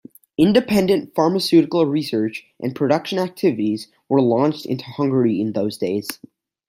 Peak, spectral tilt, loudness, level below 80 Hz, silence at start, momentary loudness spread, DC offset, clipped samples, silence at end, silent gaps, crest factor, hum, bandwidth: -2 dBFS; -6.5 dB/octave; -19 LUFS; -58 dBFS; 0.4 s; 11 LU; under 0.1%; under 0.1%; 0.55 s; none; 16 dB; none; 16 kHz